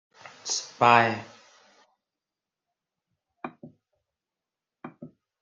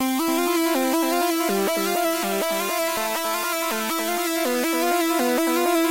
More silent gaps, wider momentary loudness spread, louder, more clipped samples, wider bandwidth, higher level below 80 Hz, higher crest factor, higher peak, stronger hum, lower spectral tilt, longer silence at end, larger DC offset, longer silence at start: neither; first, 27 LU vs 3 LU; about the same, -23 LUFS vs -22 LUFS; neither; second, 9.6 kHz vs 16 kHz; second, -76 dBFS vs -64 dBFS; first, 26 dB vs 12 dB; first, -4 dBFS vs -10 dBFS; neither; about the same, -3 dB/octave vs -2.5 dB/octave; first, 0.35 s vs 0 s; neither; first, 0.45 s vs 0 s